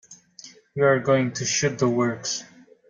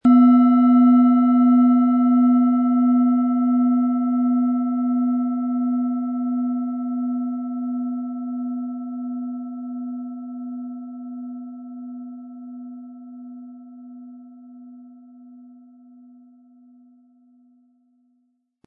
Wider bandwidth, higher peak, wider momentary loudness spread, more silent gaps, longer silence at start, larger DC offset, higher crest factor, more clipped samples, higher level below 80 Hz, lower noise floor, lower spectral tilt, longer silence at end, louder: first, 9.4 kHz vs 3.1 kHz; about the same, -8 dBFS vs -6 dBFS; second, 11 LU vs 23 LU; neither; about the same, 0.1 s vs 0.05 s; neither; about the same, 18 dB vs 14 dB; neither; first, -64 dBFS vs -74 dBFS; second, -48 dBFS vs -69 dBFS; second, -4 dB/octave vs -10 dB/octave; second, 0.45 s vs 3.3 s; second, -23 LUFS vs -19 LUFS